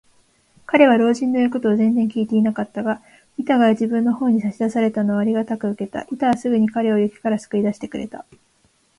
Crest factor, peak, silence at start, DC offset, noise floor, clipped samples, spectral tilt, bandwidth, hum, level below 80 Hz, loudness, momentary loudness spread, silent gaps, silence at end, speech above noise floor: 18 dB; 0 dBFS; 0.7 s; under 0.1%; -61 dBFS; under 0.1%; -7 dB/octave; 11 kHz; none; -60 dBFS; -19 LUFS; 12 LU; none; 0.8 s; 42 dB